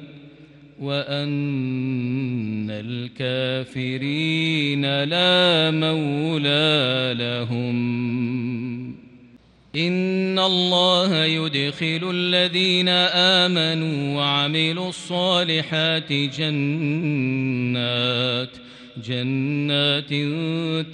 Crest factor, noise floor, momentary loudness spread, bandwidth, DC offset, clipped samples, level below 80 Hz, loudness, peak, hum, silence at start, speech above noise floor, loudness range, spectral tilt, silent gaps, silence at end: 16 dB; -51 dBFS; 10 LU; 10.5 kHz; under 0.1%; under 0.1%; -66 dBFS; -21 LUFS; -6 dBFS; none; 0 s; 30 dB; 7 LU; -5.5 dB/octave; none; 0 s